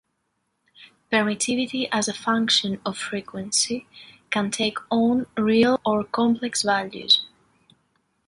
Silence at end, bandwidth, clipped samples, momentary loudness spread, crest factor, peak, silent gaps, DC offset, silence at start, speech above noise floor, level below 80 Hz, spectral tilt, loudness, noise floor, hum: 1 s; 11.5 kHz; under 0.1%; 10 LU; 18 dB; -6 dBFS; none; under 0.1%; 0.8 s; 51 dB; -62 dBFS; -3 dB/octave; -22 LUFS; -74 dBFS; none